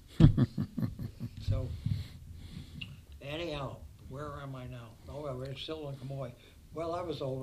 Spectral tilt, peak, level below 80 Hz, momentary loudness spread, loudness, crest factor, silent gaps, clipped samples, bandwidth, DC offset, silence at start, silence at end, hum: -8 dB/octave; -8 dBFS; -44 dBFS; 15 LU; -36 LUFS; 26 dB; none; under 0.1%; 14 kHz; under 0.1%; 0 s; 0 s; none